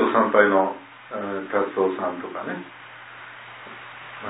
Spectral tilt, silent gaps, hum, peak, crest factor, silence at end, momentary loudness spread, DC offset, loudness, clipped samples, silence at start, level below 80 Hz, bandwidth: -9.5 dB/octave; none; none; -2 dBFS; 22 dB; 0 s; 22 LU; under 0.1%; -23 LUFS; under 0.1%; 0 s; -74 dBFS; 4 kHz